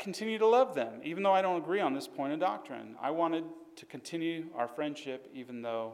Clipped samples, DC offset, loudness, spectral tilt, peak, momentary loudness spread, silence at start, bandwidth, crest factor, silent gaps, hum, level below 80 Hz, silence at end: under 0.1%; under 0.1%; -32 LUFS; -5 dB/octave; -16 dBFS; 17 LU; 0 s; 15 kHz; 16 dB; none; none; -86 dBFS; 0 s